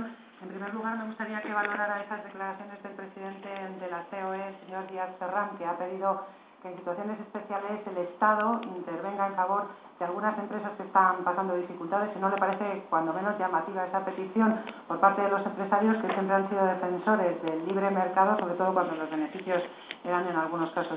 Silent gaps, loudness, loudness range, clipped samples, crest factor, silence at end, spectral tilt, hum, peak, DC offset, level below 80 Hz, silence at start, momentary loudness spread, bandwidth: none; -30 LUFS; 8 LU; under 0.1%; 22 dB; 0 s; -5 dB/octave; none; -8 dBFS; under 0.1%; -82 dBFS; 0 s; 14 LU; 4 kHz